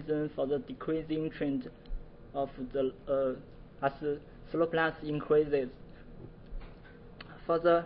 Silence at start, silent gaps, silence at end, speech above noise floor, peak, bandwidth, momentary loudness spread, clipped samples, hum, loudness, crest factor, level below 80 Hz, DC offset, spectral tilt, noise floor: 0 s; none; 0 s; 19 dB; -14 dBFS; 5.4 kHz; 22 LU; under 0.1%; none; -33 LUFS; 18 dB; -50 dBFS; under 0.1%; -10 dB/octave; -51 dBFS